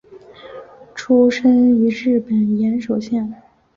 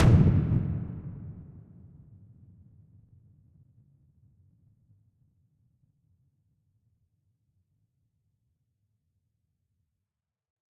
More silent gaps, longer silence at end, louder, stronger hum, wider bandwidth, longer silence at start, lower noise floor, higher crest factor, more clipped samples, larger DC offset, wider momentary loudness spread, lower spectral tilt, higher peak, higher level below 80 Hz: neither; second, 0.4 s vs 9.3 s; first, -16 LUFS vs -26 LUFS; neither; about the same, 7.4 kHz vs 7.8 kHz; about the same, 0.1 s vs 0 s; second, -40 dBFS vs -88 dBFS; second, 14 dB vs 24 dB; neither; neither; second, 22 LU vs 28 LU; second, -7 dB/octave vs -9 dB/octave; first, -4 dBFS vs -10 dBFS; second, -56 dBFS vs -44 dBFS